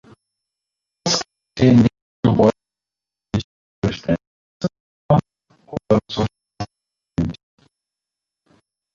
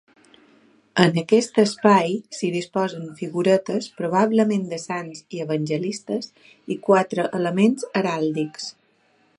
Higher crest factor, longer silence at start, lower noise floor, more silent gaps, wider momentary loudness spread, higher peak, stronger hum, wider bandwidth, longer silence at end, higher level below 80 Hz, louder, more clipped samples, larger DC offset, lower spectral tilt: about the same, 20 dB vs 22 dB; about the same, 1.05 s vs 0.95 s; first, -89 dBFS vs -62 dBFS; first, 2.02-2.23 s, 3.44-3.82 s, 4.27-4.60 s, 4.80-5.09 s vs none; first, 18 LU vs 12 LU; about the same, -2 dBFS vs 0 dBFS; neither; second, 7.4 kHz vs 11.5 kHz; first, 1.6 s vs 0.7 s; first, -44 dBFS vs -70 dBFS; about the same, -20 LUFS vs -22 LUFS; neither; neither; about the same, -6 dB/octave vs -5.5 dB/octave